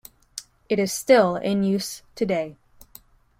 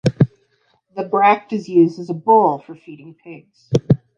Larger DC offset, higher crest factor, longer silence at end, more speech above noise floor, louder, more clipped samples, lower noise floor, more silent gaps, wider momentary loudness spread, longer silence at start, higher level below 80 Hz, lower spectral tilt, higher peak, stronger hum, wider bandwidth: neither; about the same, 20 dB vs 18 dB; first, 0.85 s vs 0.2 s; second, 30 dB vs 45 dB; second, -22 LUFS vs -17 LUFS; neither; second, -52 dBFS vs -62 dBFS; neither; about the same, 21 LU vs 20 LU; first, 0.35 s vs 0.05 s; second, -60 dBFS vs -50 dBFS; second, -5 dB/octave vs -8.5 dB/octave; second, -4 dBFS vs 0 dBFS; neither; first, 16.5 kHz vs 8.8 kHz